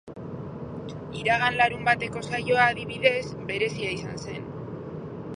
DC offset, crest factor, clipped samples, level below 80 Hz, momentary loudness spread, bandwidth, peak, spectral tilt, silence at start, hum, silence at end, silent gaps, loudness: under 0.1%; 22 dB; under 0.1%; -54 dBFS; 16 LU; 11 kHz; -4 dBFS; -5 dB/octave; 0.05 s; none; 0 s; none; -25 LUFS